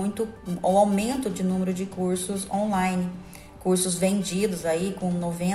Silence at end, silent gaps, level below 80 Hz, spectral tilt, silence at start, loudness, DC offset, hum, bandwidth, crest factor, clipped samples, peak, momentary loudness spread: 0 s; none; -52 dBFS; -5.5 dB/octave; 0 s; -26 LUFS; under 0.1%; none; 14.5 kHz; 16 dB; under 0.1%; -8 dBFS; 9 LU